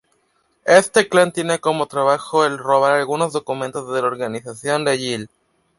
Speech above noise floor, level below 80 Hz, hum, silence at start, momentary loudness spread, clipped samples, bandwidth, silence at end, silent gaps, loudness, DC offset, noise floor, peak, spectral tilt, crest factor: 46 dB; -64 dBFS; none; 0.65 s; 12 LU; under 0.1%; 11.5 kHz; 0.55 s; none; -18 LUFS; under 0.1%; -64 dBFS; -2 dBFS; -4 dB/octave; 18 dB